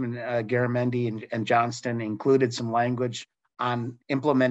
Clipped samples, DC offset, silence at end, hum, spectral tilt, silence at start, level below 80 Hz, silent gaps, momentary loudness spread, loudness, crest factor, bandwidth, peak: under 0.1%; under 0.1%; 0 s; none; -6.5 dB/octave; 0 s; -70 dBFS; none; 9 LU; -26 LUFS; 16 dB; 8.2 kHz; -10 dBFS